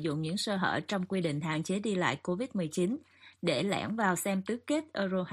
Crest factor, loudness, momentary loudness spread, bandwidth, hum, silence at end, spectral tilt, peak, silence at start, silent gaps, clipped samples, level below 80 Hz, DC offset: 18 dB; -32 LUFS; 4 LU; 15 kHz; none; 0 s; -5 dB/octave; -14 dBFS; 0 s; none; under 0.1%; -70 dBFS; under 0.1%